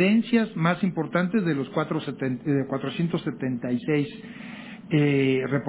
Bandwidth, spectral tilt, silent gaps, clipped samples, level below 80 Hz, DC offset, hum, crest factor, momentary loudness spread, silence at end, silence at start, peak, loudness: 4 kHz; -11 dB/octave; none; under 0.1%; -64 dBFS; under 0.1%; none; 16 dB; 11 LU; 0 s; 0 s; -8 dBFS; -25 LUFS